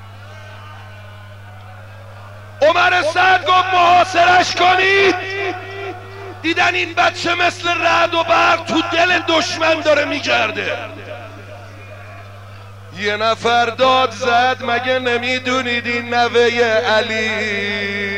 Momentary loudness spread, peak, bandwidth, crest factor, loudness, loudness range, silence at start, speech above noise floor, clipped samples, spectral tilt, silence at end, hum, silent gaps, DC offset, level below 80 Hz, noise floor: 23 LU; -2 dBFS; 15 kHz; 14 dB; -15 LUFS; 7 LU; 0 s; 20 dB; under 0.1%; -3.5 dB/octave; 0 s; 50 Hz at -35 dBFS; none; 0.4%; -56 dBFS; -36 dBFS